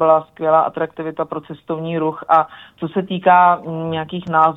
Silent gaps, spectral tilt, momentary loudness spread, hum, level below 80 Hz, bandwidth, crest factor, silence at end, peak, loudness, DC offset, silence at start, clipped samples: none; -8.5 dB/octave; 13 LU; none; -60 dBFS; 4 kHz; 16 dB; 0 s; -2 dBFS; -18 LUFS; under 0.1%; 0 s; under 0.1%